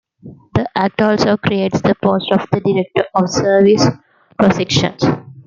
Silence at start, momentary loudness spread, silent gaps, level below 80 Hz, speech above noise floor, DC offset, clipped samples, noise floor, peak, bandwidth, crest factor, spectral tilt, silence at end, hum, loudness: 0.25 s; 6 LU; none; -48 dBFS; 25 dB; under 0.1%; under 0.1%; -39 dBFS; 0 dBFS; 7.6 kHz; 14 dB; -5.5 dB/octave; 0.05 s; none; -15 LUFS